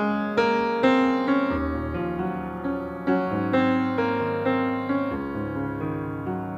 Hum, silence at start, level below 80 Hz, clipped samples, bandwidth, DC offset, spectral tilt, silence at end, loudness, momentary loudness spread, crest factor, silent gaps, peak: none; 0 s; -46 dBFS; under 0.1%; 7.6 kHz; under 0.1%; -7.5 dB/octave; 0 s; -25 LUFS; 8 LU; 16 dB; none; -8 dBFS